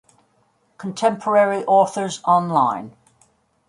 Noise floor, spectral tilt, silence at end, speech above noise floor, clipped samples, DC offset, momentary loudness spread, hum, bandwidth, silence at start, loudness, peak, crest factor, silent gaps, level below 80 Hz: -63 dBFS; -5 dB/octave; 0.8 s; 45 dB; under 0.1%; under 0.1%; 15 LU; none; 11.5 kHz; 0.8 s; -19 LUFS; -4 dBFS; 18 dB; none; -70 dBFS